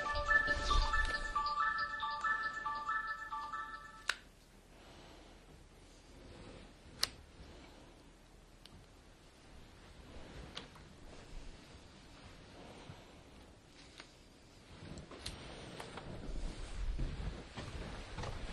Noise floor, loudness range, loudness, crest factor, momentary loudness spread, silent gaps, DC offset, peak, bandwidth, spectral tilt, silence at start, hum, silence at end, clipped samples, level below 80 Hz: -61 dBFS; 19 LU; -39 LUFS; 30 dB; 25 LU; none; under 0.1%; -12 dBFS; 12 kHz; -3 dB/octave; 0 s; none; 0 s; under 0.1%; -48 dBFS